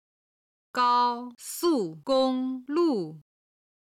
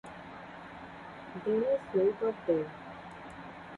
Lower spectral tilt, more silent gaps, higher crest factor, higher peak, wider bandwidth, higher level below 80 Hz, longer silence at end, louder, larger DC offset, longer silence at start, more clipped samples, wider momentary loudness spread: second, -4.5 dB/octave vs -7.5 dB/octave; neither; about the same, 14 dB vs 18 dB; about the same, -14 dBFS vs -16 dBFS; first, 16.5 kHz vs 10.5 kHz; second, -74 dBFS vs -66 dBFS; first, 0.75 s vs 0 s; first, -27 LUFS vs -31 LUFS; neither; first, 0.75 s vs 0.05 s; neither; second, 12 LU vs 17 LU